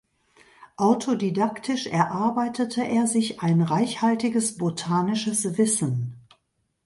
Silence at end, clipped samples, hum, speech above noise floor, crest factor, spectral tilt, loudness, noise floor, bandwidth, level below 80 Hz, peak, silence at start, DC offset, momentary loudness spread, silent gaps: 0.65 s; under 0.1%; none; 49 dB; 18 dB; -5 dB/octave; -24 LUFS; -73 dBFS; 11.5 kHz; -66 dBFS; -8 dBFS; 0.6 s; under 0.1%; 4 LU; none